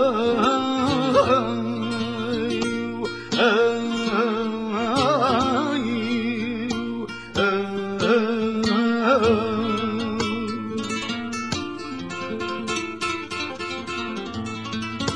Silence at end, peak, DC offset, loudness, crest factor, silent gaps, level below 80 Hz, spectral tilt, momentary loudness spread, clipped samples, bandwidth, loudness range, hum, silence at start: 0 s; -4 dBFS; 0.3%; -23 LUFS; 18 dB; none; -52 dBFS; -5 dB/octave; 10 LU; under 0.1%; 10.5 kHz; 6 LU; none; 0 s